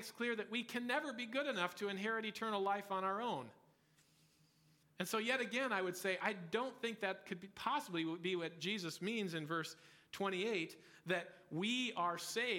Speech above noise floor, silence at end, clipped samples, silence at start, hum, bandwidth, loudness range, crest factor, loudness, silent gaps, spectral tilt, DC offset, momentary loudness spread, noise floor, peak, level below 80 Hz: 32 dB; 0 s; under 0.1%; 0 s; none; 17.5 kHz; 2 LU; 20 dB; -41 LUFS; none; -4 dB/octave; under 0.1%; 6 LU; -73 dBFS; -22 dBFS; -88 dBFS